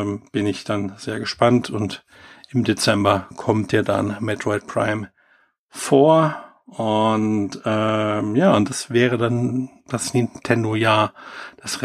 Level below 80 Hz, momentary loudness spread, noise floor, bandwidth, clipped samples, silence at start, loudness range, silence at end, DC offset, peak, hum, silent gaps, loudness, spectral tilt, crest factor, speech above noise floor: -60 dBFS; 12 LU; -60 dBFS; 14.5 kHz; under 0.1%; 0 s; 2 LU; 0 s; under 0.1%; -2 dBFS; none; 5.58-5.69 s; -20 LUFS; -5.5 dB/octave; 18 dB; 40 dB